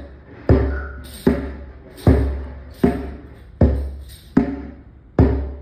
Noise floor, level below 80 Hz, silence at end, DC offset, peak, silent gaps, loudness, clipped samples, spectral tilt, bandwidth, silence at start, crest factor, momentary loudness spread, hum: -41 dBFS; -26 dBFS; 0 s; under 0.1%; -2 dBFS; none; -20 LUFS; under 0.1%; -9 dB/octave; 14.5 kHz; 0 s; 20 dB; 20 LU; none